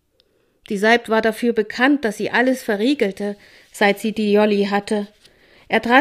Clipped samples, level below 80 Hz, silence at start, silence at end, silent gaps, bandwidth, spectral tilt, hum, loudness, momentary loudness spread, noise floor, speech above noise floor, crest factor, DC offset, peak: under 0.1%; -58 dBFS; 0.7 s; 0 s; none; 15.5 kHz; -5 dB/octave; none; -19 LUFS; 12 LU; -62 dBFS; 44 dB; 18 dB; under 0.1%; 0 dBFS